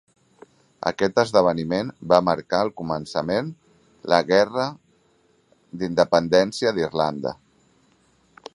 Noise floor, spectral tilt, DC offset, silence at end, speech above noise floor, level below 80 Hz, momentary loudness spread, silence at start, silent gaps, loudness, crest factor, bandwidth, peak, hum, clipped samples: -62 dBFS; -5.5 dB/octave; under 0.1%; 1.2 s; 41 dB; -58 dBFS; 13 LU; 0.8 s; none; -22 LUFS; 22 dB; 11.5 kHz; 0 dBFS; none; under 0.1%